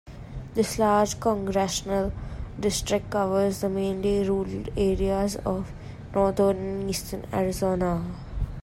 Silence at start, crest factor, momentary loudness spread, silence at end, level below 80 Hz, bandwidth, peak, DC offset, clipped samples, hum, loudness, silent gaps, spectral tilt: 0.05 s; 16 dB; 12 LU; 0 s; -40 dBFS; 16 kHz; -10 dBFS; under 0.1%; under 0.1%; none; -26 LUFS; none; -5.5 dB/octave